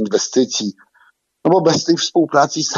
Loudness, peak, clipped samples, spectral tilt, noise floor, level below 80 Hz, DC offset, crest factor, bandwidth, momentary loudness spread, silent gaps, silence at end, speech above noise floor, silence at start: -16 LUFS; 0 dBFS; under 0.1%; -4 dB/octave; -56 dBFS; -66 dBFS; under 0.1%; 16 dB; 7.6 kHz; 8 LU; none; 0 s; 40 dB; 0 s